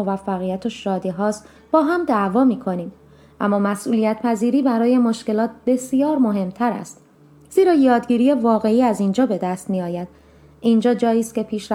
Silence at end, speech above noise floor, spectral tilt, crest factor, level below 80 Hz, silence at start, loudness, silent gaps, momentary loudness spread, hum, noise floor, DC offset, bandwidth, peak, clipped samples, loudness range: 0 s; 28 dB; -6.5 dB/octave; 16 dB; -58 dBFS; 0 s; -19 LUFS; none; 9 LU; none; -47 dBFS; under 0.1%; 13.5 kHz; -2 dBFS; under 0.1%; 2 LU